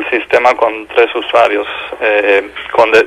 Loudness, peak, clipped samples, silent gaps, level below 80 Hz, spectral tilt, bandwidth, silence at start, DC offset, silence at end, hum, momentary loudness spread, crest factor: -12 LUFS; 0 dBFS; 0.4%; none; -50 dBFS; -3.5 dB/octave; 12 kHz; 0 s; under 0.1%; 0 s; none; 7 LU; 12 dB